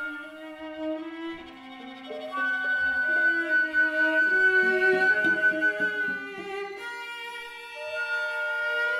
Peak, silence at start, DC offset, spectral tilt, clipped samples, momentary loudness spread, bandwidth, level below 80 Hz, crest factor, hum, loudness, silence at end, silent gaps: -12 dBFS; 0 s; under 0.1%; -3.5 dB/octave; under 0.1%; 18 LU; 13 kHz; -68 dBFS; 14 dB; none; -25 LUFS; 0 s; none